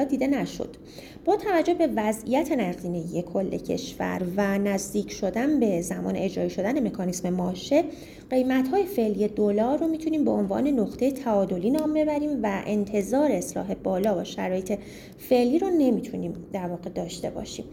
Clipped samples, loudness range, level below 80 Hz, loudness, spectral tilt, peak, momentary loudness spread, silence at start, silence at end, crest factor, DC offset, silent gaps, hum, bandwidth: under 0.1%; 2 LU; -54 dBFS; -26 LUFS; -6 dB/octave; -10 dBFS; 10 LU; 0 s; 0 s; 16 dB; under 0.1%; none; none; 17 kHz